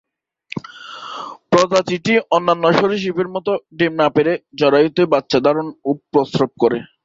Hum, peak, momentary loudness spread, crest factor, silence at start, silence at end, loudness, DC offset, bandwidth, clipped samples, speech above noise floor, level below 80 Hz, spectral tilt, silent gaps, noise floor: none; 0 dBFS; 16 LU; 16 dB; 0.55 s; 0.2 s; -17 LUFS; under 0.1%; 7.8 kHz; under 0.1%; 23 dB; -58 dBFS; -5.5 dB/octave; none; -39 dBFS